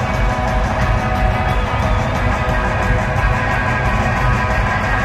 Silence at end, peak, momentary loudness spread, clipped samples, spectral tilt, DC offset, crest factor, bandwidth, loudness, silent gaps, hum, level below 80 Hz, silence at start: 0 s; -2 dBFS; 1 LU; under 0.1%; -6 dB/octave; 0.4%; 14 dB; 13 kHz; -17 LUFS; none; none; -20 dBFS; 0 s